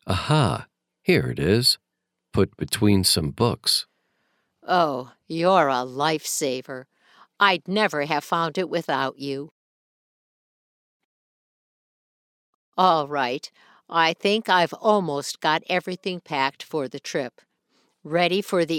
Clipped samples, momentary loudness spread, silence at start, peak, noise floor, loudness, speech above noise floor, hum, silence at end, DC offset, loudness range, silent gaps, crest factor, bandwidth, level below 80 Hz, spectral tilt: under 0.1%; 13 LU; 0.05 s; -2 dBFS; -80 dBFS; -23 LUFS; 58 dB; none; 0 s; under 0.1%; 7 LU; 9.51-12.72 s; 22 dB; 18 kHz; -56 dBFS; -4 dB/octave